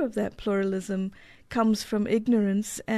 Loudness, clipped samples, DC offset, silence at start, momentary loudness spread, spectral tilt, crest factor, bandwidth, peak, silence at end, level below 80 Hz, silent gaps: -27 LUFS; under 0.1%; under 0.1%; 0 s; 8 LU; -6 dB/octave; 16 dB; 13.5 kHz; -10 dBFS; 0 s; -54 dBFS; none